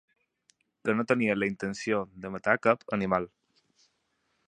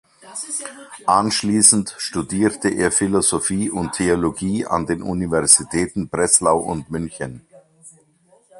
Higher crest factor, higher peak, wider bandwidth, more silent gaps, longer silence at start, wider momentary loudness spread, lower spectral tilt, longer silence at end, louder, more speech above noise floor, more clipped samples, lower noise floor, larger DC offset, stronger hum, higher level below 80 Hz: about the same, 24 dB vs 20 dB; second, -8 dBFS vs 0 dBFS; second, 10 kHz vs 15 kHz; neither; first, 0.85 s vs 0.25 s; second, 9 LU vs 14 LU; first, -6 dB/octave vs -3.5 dB/octave; first, 1.2 s vs 0 s; second, -29 LUFS vs -18 LUFS; first, 47 dB vs 37 dB; neither; first, -76 dBFS vs -56 dBFS; neither; neither; second, -64 dBFS vs -46 dBFS